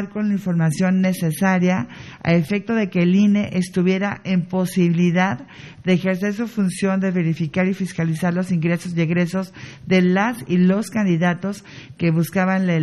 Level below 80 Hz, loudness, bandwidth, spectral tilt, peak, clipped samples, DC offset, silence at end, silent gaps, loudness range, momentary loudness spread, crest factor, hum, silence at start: -56 dBFS; -20 LUFS; 12.5 kHz; -7 dB/octave; -4 dBFS; under 0.1%; under 0.1%; 0 s; none; 2 LU; 7 LU; 14 dB; none; 0 s